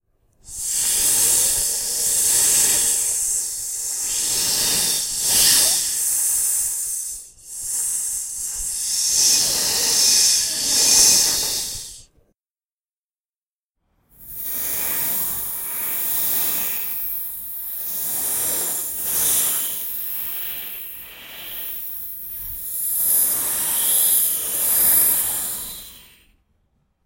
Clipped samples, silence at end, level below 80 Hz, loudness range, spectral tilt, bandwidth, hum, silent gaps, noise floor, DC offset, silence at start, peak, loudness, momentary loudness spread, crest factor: under 0.1%; 1.05 s; -50 dBFS; 9 LU; 1.5 dB/octave; 16.5 kHz; none; 12.51-12.55 s, 12.64-12.68 s, 12.74-12.84 s, 12.91-13.09 s, 13.19-13.25 s, 13.36-13.70 s; under -90 dBFS; under 0.1%; 0.45 s; 0 dBFS; -17 LUFS; 15 LU; 22 dB